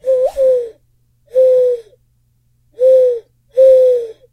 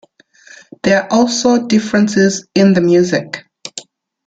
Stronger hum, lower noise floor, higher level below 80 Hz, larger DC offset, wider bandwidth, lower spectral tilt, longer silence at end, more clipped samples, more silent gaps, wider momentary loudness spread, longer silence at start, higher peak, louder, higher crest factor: neither; first, -58 dBFS vs -45 dBFS; about the same, -52 dBFS vs -54 dBFS; neither; second, 5.4 kHz vs 9.2 kHz; about the same, -4.5 dB/octave vs -5 dB/octave; second, 0.2 s vs 0.45 s; neither; neither; second, 13 LU vs 17 LU; second, 0.05 s vs 0.85 s; about the same, -2 dBFS vs -2 dBFS; about the same, -12 LUFS vs -13 LUFS; about the same, 12 dB vs 12 dB